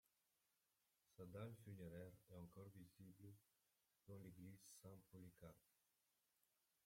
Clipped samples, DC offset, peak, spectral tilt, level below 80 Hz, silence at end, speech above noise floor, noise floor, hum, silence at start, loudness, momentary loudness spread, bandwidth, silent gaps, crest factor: under 0.1%; under 0.1%; -44 dBFS; -6.5 dB/octave; -86 dBFS; 1.1 s; 28 dB; -89 dBFS; none; 1.1 s; -62 LUFS; 9 LU; 16.5 kHz; none; 20 dB